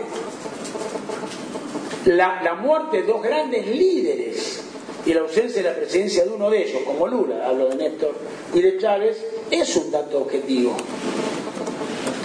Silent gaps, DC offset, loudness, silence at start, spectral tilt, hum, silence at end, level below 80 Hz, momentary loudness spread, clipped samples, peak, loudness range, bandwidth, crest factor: none; under 0.1%; -22 LUFS; 0 s; -4 dB/octave; none; 0 s; -62 dBFS; 11 LU; under 0.1%; -4 dBFS; 2 LU; 10.5 kHz; 16 dB